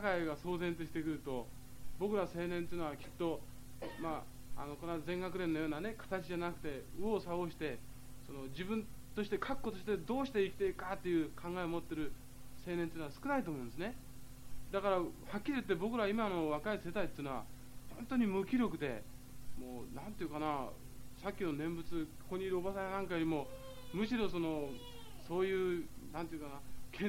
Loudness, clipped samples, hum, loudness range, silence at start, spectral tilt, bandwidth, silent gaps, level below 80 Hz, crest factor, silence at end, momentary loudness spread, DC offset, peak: -40 LUFS; under 0.1%; none; 4 LU; 0 s; -6 dB/octave; 16 kHz; none; -56 dBFS; 20 dB; 0 s; 16 LU; 0.3%; -20 dBFS